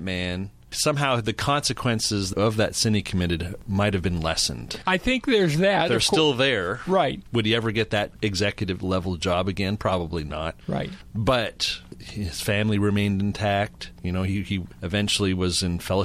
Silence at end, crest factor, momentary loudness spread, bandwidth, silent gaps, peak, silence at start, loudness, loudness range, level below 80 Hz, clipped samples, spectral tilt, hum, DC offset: 0 s; 18 dB; 10 LU; 15 kHz; none; -6 dBFS; 0 s; -24 LUFS; 5 LU; -44 dBFS; under 0.1%; -4.5 dB/octave; none; under 0.1%